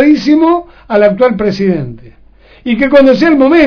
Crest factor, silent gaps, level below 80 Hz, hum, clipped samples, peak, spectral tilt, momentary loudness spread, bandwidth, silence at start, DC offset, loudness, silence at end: 10 dB; none; -40 dBFS; none; 2%; 0 dBFS; -7.5 dB/octave; 10 LU; 5.4 kHz; 0 s; under 0.1%; -9 LUFS; 0 s